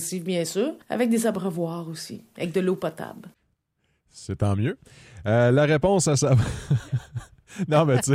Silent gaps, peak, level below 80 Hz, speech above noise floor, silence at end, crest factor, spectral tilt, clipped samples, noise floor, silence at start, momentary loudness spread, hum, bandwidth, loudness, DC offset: none; -6 dBFS; -48 dBFS; 49 dB; 0 s; 18 dB; -6 dB/octave; under 0.1%; -72 dBFS; 0 s; 18 LU; none; 16 kHz; -24 LUFS; under 0.1%